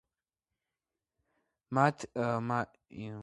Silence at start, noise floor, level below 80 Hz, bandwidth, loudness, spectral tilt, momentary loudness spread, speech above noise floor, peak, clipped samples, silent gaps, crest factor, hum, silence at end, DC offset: 1.7 s; under -90 dBFS; -70 dBFS; 11.5 kHz; -32 LUFS; -7 dB/octave; 15 LU; over 57 dB; -10 dBFS; under 0.1%; none; 26 dB; none; 0 s; under 0.1%